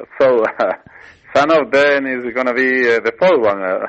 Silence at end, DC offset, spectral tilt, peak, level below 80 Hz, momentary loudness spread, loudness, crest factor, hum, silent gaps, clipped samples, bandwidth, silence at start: 0 s; under 0.1%; -5 dB/octave; -4 dBFS; -58 dBFS; 7 LU; -15 LUFS; 12 dB; none; none; under 0.1%; 8.2 kHz; 0 s